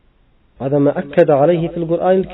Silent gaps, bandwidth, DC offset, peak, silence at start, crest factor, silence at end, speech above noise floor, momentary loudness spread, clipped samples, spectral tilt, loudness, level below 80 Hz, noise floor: none; 4.1 kHz; under 0.1%; 0 dBFS; 0.6 s; 16 dB; 0 s; 39 dB; 7 LU; under 0.1%; -7.5 dB/octave; -15 LUFS; -48 dBFS; -54 dBFS